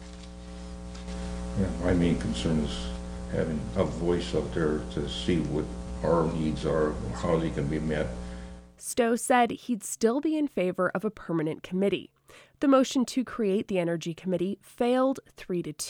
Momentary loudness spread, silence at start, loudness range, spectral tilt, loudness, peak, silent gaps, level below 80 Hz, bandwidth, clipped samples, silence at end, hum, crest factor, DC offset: 13 LU; 0 s; 2 LU; -5.5 dB/octave; -28 LUFS; -10 dBFS; none; -42 dBFS; 19 kHz; under 0.1%; 0 s; none; 18 dB; under 0.1%